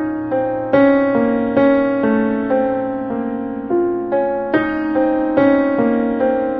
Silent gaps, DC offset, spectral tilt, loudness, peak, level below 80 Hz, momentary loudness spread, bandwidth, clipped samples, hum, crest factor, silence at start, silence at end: none; under 0.1%; -10 dB/octave; -17 LUFS; -2 dBFS; -48 dBFS; 7 LU; 4.9 kHz; under 0.1%; none; 14 dB; 0 s; 0 s